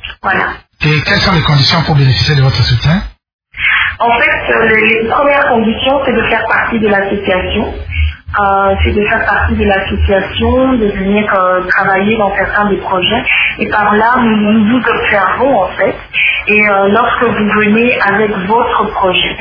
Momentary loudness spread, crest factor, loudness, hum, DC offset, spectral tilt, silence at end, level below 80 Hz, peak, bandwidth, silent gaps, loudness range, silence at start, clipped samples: 5 LU; 10 dB; -10 LUFS; none; under 0.1%; -6.5 dB/octave; 0 s; -26 dBFS; 0 dBFS; 5.4 kHz; 3.33-3.39 s; 2 LU; 0 s; under 0.1%